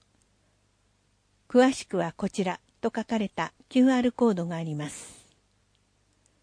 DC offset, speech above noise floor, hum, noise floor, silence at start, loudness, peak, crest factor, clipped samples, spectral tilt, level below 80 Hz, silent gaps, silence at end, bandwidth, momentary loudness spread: under 0.1%; 43 dB; 50 Hz at -55 dBFS; -68 dBFS; 1.5 s; -27 LUFS; -10 dBFS; 18 dB; under 0.1%; -5.5 dB/octave; -64 dBFS; none; 1.3 s; 10.5 kHz; 12 LU